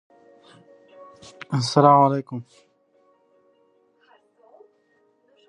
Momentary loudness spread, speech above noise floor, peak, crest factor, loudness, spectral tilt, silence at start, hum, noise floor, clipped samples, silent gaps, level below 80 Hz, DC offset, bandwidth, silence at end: 22 LU; 45 dB; -2 dBFS; 24 dB; -18 LUFS; -6.5 dB/octave; 1.5 s; none; -64 dBFS; under 0.1%; none; -72 dBFS; under 0.1%; 11 kHz; 3.05 s